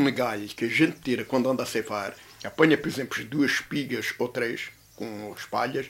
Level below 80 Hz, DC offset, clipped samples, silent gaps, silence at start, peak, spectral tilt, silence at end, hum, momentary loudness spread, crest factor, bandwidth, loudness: -64 dBFS; under 0.1%; under 0.1%; none; 0 s; -6 dBFS; -5 dB/octave; 0 s; none; 14 LU; 22 dB; 16 kHz; -27 LUFS